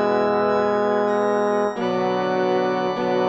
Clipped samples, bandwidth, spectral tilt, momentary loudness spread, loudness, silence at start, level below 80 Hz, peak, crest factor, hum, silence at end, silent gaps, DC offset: under 0.1%; 8 kHz; -6.5 dB/octave; 3 LU; -21 LUFS; 0 s; -62 dBFS; -8 dBFS; 12 dB; none; 0 s; none; under 0.1%